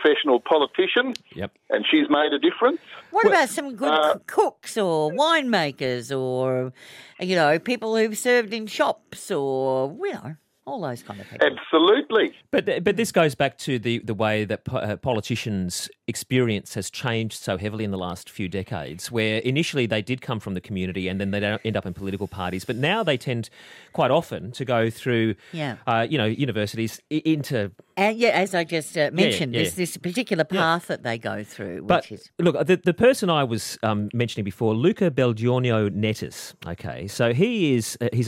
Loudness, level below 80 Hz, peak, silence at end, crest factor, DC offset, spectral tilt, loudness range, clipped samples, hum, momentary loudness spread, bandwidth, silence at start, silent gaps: -23 LUFS; -60 dBFS; -6 dBFS; 0 s; 18 dB; under 0.1%; -5 dB/octave; 5 LU; under 0.1%; none; 11 LU; 16.5 kHz; 0 s; none